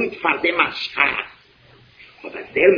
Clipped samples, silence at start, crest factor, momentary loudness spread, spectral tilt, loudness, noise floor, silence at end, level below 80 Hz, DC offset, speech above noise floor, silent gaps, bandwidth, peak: under 0.1%; 0 s; 20 dB; 17 LU; -5.5 dB/octave; -19 LUFS; -51 dBFS; 0 s; -58 dBFS; under 0.1%; 32 dB; none; 5.4 kHz; 0 dBFS